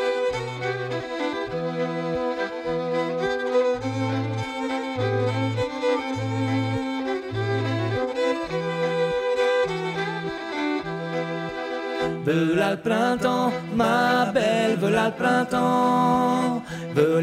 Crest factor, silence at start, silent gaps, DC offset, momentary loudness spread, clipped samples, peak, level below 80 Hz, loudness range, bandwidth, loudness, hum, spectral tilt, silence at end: 18 dB; 0 s; none; under 0.1%; 8 LU; under 0.1%; -6 dBFS; -56 dBFS; 5 LU; 15.5 kHz; -24 LUFS; none; -6 dB/octave; 0 s